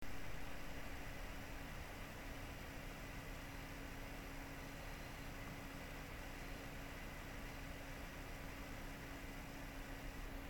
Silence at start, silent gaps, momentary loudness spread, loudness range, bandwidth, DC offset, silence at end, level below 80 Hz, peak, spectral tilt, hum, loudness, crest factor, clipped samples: 0 s; none; 0 LU; 0 LU; 17.5 kHz; under 0.1%; 0 s; -54 dBFS; -34 dBFS; -4.5 dB/octave; none; -51 LUFS; 14 dB; under 0.1%